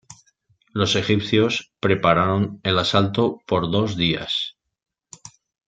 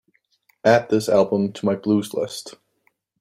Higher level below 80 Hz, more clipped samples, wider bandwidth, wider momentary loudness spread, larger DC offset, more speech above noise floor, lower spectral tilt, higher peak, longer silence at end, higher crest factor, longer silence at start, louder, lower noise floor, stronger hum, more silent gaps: first, -54 dBFS vs -64 dBFS; neither; second, 9 kHz vs 15.5 kHz; second, 6 LU vs 11 LU; neither; second, 43 dB vs 48 dB; about the same, -5.5 dB/octave vs -6 dB/octave; about the same, -2 dBFS vs -2 dBFS; second, 0.4 s vs 0.7 s; about the same, 20 dB vs 20 dB; second, 0.1 s vs 0.65 s; about the same, -21 LUFS vs -20 LUFS; second, -63 dBFS vs -67 dBFS; neither; neither